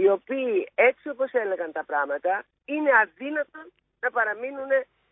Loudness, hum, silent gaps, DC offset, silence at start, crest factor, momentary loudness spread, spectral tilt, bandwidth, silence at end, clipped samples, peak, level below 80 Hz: -25 LUFS; none; none; under 0.1%; 0 s; 20 dB; 10 LU; -8 dB/octave; 3.8 kHz; 0.3 s; under 0.1%; -6 dBFS; -76 dBFS